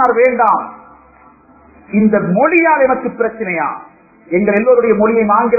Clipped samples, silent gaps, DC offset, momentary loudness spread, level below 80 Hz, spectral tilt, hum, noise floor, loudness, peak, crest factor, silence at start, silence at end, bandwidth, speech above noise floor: under 0.1%; none; under 0.1%; 9 LU; -50 dBFS; -11 dB/octave; none; -45 dBFS; -13 LUFS; 0 dBFS; 14 dB; 0 s; 0 s; 2.7 kHz; 32 dB